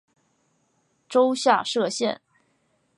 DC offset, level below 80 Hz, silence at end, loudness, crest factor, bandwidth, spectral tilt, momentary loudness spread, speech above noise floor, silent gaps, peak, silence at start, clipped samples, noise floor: under 0.1%; -80 dBFS; 0.85 s; -23 LUFS; 20 dB; 11.5 kHz; -3 dB/octave; 8 LU; 47 dB; none; -4 dBFS; 1.1 s; under 0.1%; -69 dBFS